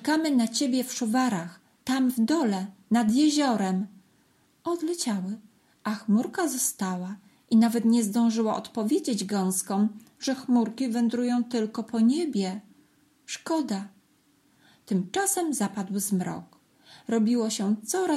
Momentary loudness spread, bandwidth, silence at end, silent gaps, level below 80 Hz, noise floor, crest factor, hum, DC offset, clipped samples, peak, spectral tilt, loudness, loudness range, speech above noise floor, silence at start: 12 LU; 15 kHz; 0 s; none; -76 dBFS; -65 dBFS; 14 dB; none; under 0.1%; under 0.1%; -12 dBFS; -4.5 dB/octave; -26 LUFS; 5 LU; 39 dB; 0 s